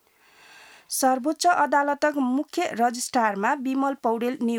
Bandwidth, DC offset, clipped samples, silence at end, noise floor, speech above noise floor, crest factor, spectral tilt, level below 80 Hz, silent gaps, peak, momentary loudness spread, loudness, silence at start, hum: 19.5 kHz; under 0.1%; under 0.1%; 0 s; -55 dBFS; 32 dB; 16 dB; -3 dB/octave; -76 dBFS; none; -8 dBFS; 5 LU; -24 LUFS; 0.9 s; none